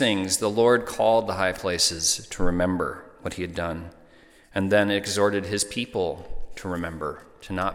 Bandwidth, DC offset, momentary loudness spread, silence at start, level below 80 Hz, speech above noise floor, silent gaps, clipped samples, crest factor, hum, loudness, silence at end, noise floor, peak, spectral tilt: 17 kHz; under 0.1%; 15 LU; 0 s; -42 dBFS; 29 dB; none; under 0.1%; 18 dB; none; -24 LUFS; 0 s; -53 dBFS; -6 dBFS; -3.5 dB/octave